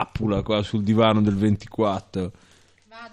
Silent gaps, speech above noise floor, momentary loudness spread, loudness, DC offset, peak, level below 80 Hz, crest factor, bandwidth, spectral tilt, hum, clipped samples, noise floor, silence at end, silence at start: none; 27 dB; 12 LU; -22 LUFS; under 0.1%; -6 dBFS; -46 dBFS; 16 dB; 9.4 kHz; -7.5 dB/octave; none; under 0.1%; -49 dBFS; 0.05 s; 0 s